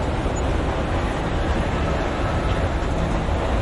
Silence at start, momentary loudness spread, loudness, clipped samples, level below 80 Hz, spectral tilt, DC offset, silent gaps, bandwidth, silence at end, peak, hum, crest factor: 0 s; 1 LU; -23 LUFS; under 0.1%; -26 dBFS; -6.5 dB/octave; under 0.1%; none; 11.5 kHz; 0 s; -10 dBFS; none; 12 dB